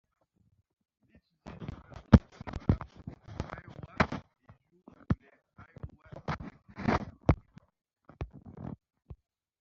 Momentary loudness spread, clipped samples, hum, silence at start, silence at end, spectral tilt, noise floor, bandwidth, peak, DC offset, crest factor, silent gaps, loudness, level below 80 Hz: 24 LU; under 0.1%; none; 1.45 s; 0.45 s; -7 dB/octave; -54 dBFS; 7.4 kHz; -4 dBFS; under 0.1%; 30 dB; none; -32 LUFS; -46 dBFS